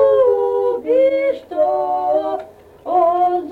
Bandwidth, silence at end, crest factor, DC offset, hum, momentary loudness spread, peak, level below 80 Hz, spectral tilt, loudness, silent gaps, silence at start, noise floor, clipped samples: 4.6 kHz; 0 s; 12 dB; under 0.1%; none; 6 LU; -4 dBFS; -58 dBFS; -6.5 dB/octave; -17 LUFS; none; 0 s; -36 dBFS; under 0.1%